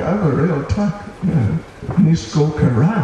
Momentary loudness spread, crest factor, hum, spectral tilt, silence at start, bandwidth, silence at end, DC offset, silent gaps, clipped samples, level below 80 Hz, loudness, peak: 7 LU; 12 dB; none; -8 dB/octave; 0 s; 8.6 kHz; 0 s; under 0.1%; none; under 0.1%; -36 dBFS; -17 LUFS; -4 dBFS